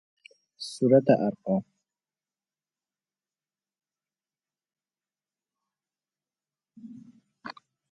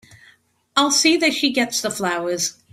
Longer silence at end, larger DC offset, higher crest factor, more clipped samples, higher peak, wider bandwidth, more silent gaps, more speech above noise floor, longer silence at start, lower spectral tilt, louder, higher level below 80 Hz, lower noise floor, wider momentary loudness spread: first, 0.4 s vs 0.2 s; neither; first, 26 dB vs 20 dB; neither; second, -6 dBFS vs -2 dBFS; second, 11.5 kHz vs 16 kHz; neither; first, over 66 dB vs 37 dB; second, 0.6 s vs 0.75 s; first, -7 dB/octave vs -1.5 dB/octave; second, -24 LUFS vs -18 LUFS; second, -76 dBFS vs -64 dBFS; first, under -90 dBFS vs -56 dBFS; first, 27 LU vs 8 LU